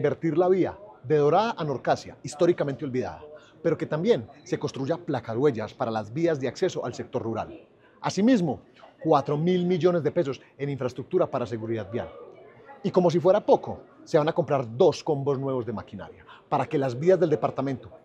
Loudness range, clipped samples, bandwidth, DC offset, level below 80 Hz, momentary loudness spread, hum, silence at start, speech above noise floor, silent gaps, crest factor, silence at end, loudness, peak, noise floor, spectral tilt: 4 LU; under 0.1%; 9 kHz; under 0.1%; -66 dBFS; 12 LU; none; 0 s; 23 dB; none; 18 dB; 0.1 s; -26 LUFS; -8 dBFS; -49 dBFS; -7 dB/octave